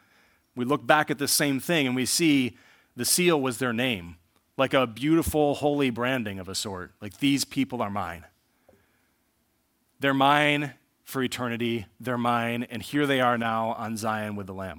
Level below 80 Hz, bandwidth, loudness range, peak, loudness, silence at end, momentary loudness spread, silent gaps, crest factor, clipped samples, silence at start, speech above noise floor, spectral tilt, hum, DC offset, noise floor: -58 dBFS; 18 kHz; 6 LU; -4 dBFS; -25 LUFS; 0 s; 12 LU; none; 24 dB; under 0.1%; 0.55 s; 45 dB; -4 dB/octave; none; under 0.1%; -71 dBFS